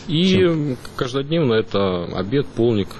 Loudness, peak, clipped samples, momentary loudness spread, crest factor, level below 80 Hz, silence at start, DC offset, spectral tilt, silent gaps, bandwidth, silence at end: -20 LUFS; -6 dBFS; under 0.1%; 8 LU; 12 dB; -44 dBFS; 0 s; under 0.1%; -7 dB/octave; none; 12 kHz; 0 s